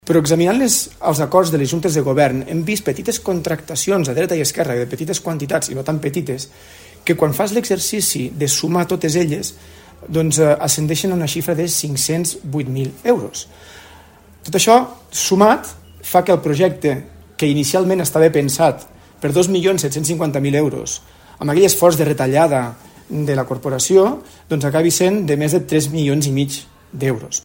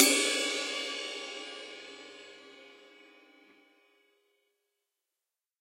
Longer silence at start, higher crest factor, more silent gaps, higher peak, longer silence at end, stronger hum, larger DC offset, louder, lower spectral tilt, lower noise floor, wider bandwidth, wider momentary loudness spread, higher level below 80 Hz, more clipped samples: about the same, 0.05 s vs 0 s; second, 18 dB vs 34 dB; neither; about the same, 0 dBFS vs -2 dBFS; second, 0.05 s vs 2.85 s; neither; neither; first, -17 LUFS vs -31 LUFS; first, -4.5 dB/octave vs 1.5 dB/octave; second, -44 dBFS vs -90 dBFS; about the same, 16.5 kHz vs 16 kHz; second, 10 LU vs 25 LU; first, -50 dBFS vs under -90 dBFS; neither